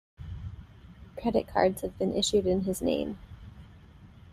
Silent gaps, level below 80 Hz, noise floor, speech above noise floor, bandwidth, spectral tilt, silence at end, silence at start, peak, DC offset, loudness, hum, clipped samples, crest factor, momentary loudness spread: none; -50 dBFS; -52 dBFS; 24 dB; 15 kHz; -5 dB/octave; 0 s; 0.2 s; -10 dBFS; under 0.1%; -29 LUFS; none; under 0.1%; 22 dB; 22 LU